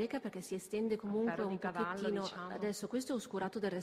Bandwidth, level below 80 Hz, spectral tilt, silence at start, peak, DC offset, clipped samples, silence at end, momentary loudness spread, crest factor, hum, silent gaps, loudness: 15.5 kHz; -74 dBFS; -5.5 dB/octave; 0 s; -24 dBFS; under 0.1%; under 0.1%; 0 s; 5 LU; 16 dB; none; none; -39 LUFS